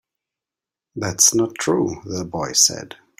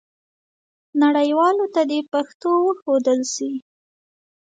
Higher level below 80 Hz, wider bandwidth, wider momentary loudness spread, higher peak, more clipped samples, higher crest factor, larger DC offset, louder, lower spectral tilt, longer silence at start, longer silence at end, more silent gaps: first, -56 dBFS vs -76 dBFS; first, 16 kHz vs 9.2 kHz; first, 14 LU vs 9 LU; first, 0 dBFS vs -6 dBFS; neither; first, 22 dB vs 14 dB; neither; about the same, -18 LUFS vs -20 LUFS; about the same, -2.5 dB/octave vs -2.5 dB/octave; about the same, 0.95 s vs 0.95 s; second, 0.25 s vs 0.9 s; second, none vs 2.34-2.40 s, 2.82-2.86 s